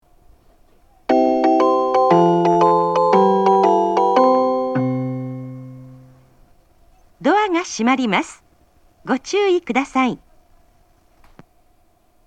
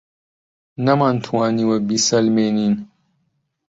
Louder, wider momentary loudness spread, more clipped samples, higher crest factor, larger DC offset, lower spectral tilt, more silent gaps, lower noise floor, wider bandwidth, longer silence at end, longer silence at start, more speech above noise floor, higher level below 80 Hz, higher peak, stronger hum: about the same, -17 LUFS vs -18 LUFS; first, 16 LU vs 7 LU; neither; about the same, 18 dB vs 16 dB; neither; about the same, -6 dB/octave vs -5 dB/octave; neither; second, -58 dBFS vs -69 dBFS; first, 9.2 kHz vs 8 kHz; first, 2.1 s vs 0.85 s; first, 1.1 s vs 0.8 s; second, 39 dB vs 52 dB; about the same, -58 dBFS vs -60 dBFS; first, 0 dBFS vs -4 dBFS; neither